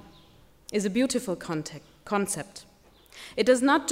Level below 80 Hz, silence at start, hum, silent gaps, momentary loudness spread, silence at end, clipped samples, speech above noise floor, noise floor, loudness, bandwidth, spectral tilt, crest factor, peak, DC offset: -62 dBFS; 0.7 s; none; none; 23 LU; 0 s; under 0.1%; 30 dB; -56 dBFS; -27 LUFS; 16 kHz; -4 dB/octave; 20 dB; -8 dBFS; under 0.1%